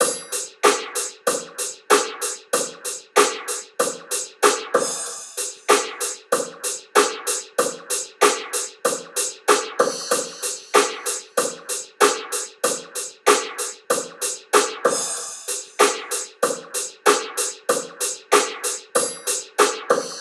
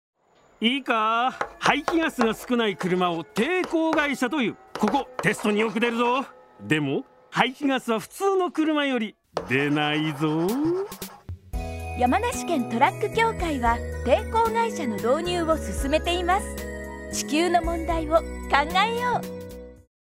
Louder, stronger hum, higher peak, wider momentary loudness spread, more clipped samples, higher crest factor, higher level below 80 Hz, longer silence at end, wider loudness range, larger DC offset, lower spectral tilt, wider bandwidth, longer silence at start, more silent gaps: about the same, -22 LUFS vs -24 LUFS; neither; about the same, 0 dBFS vs -2 dBFS; about the same, 9 LU vs 11 LU; neither; about the same, 22 dB vs 22 dB; second, -78 dBFS vs -42 dBFS; second, 0 s vs 0.25 s; about the same, 1 LU vs 2 LU; neither; second, 0 dB/octave vs -4.5 dB/octave; about the same, 16 kHz vs 16 kHz; second, 0 s vs 0.6 s; neither